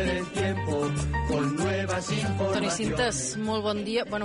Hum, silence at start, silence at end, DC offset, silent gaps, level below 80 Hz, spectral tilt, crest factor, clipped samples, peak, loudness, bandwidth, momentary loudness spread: none; 0 s; 0 s; under 0.1%; none; -42 dBFS; -4.5 dB/octave; 12 dB; under 0.1%; -16 dBFS; -28 LUFS; 10.5 kHz; 2 LU